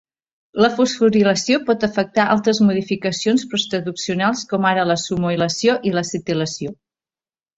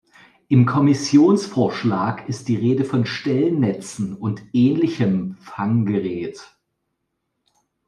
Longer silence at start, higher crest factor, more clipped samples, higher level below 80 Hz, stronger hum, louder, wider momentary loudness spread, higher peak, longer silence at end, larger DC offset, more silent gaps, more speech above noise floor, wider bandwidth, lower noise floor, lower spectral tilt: about the same, 0.55 s vs 0.5 s; about the same, 18 dB vs 18 dB; neither; first, -56 dBFS vs -62 dBFS; neither; about the same, -18 LUFS vs -20 LUFS; second, 7 LU vs 12 LU; about the same, -2 dBFS vs -2 dBFS; second, 0.85 s vs 1.45 s; neither; neither; first, over 72 dB vs 57 dB; second, 8 kHz vs 11.5 kHz; first, under -90 dBFS vs -75 dBFS; second, -4.5 dB/octave vs -7 dB/octave